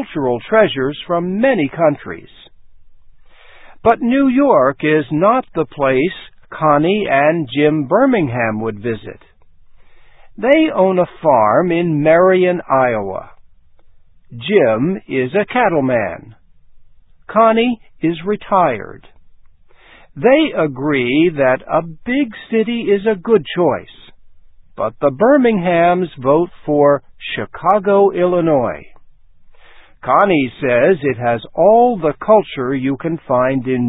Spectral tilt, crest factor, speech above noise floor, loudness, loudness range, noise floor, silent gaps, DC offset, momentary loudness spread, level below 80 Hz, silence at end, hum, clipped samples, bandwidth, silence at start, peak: -10.5 dB/octave; 16 dB; 30 dB; -15 LUFS; 4 LU; -44 dBFS; none; under 0.1%; 10 LU; -50 dBFS; 0 s; none; under 0.1%; 4 kHz; 0 s; 0 dBFS